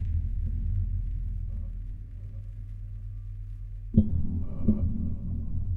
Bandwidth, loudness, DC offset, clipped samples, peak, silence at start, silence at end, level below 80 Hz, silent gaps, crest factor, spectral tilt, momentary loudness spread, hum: 2.2 kHz; -33 LUFS; under 0.1%; under 0.1%; -6 dBFS; 0 s; 0 s; -34 dBFS; none; 22 dB; -12.5 dB/octave; 14 LU; none